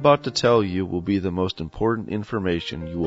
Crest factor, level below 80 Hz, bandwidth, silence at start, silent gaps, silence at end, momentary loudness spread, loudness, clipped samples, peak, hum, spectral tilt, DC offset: 20 dB; -46 dBFS; 8 kHz; 0 s; none; 0 s; 8 LU; -23 LUFS; under 0.1%; -2 dBFS; none; -6 dB/octave; under 0.1%